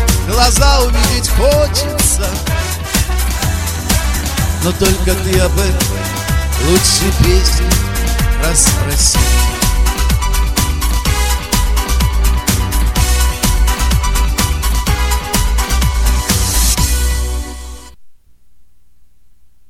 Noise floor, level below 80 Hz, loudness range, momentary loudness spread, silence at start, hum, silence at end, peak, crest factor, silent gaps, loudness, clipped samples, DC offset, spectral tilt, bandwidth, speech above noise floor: -50 dBFS; -16 dBFS; 3 LU; 6 LU; 0 s; none; 1.35 s; 0 dBFS; 12 dB; none; -13 LUFS; under 0.1%; 1%; -3.5 dB/octave; 16.5 kHz; 39 dB